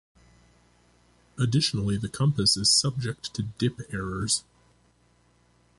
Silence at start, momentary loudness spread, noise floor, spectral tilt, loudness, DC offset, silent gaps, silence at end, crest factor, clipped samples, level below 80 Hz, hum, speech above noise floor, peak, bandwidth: 1.35 s; 13 LU; -63 dBFS; -3.5 dB/octave; -25 LUFS; under 0.1%; none; 1.4 s; 20 dB; under 0.1%; -52 dBFS; 60 Hz at -50 dBFS; 38 dB; -10 dBFS; 11.5 kHz